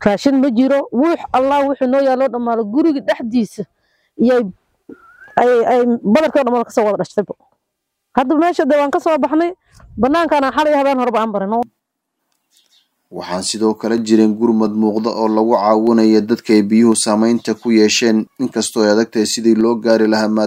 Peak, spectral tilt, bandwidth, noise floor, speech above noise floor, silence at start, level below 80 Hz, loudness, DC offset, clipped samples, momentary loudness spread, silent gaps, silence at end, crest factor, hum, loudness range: 0 dBFS; -4.5 dB/octave; 15.5 kHz; -74 dBFS; 60 dB; 0 s; -54 dBFS; -15 LUFS; under 0.1%; under 0.1%; 9 LU; none; 0 s; 14 dB; none; 5 LU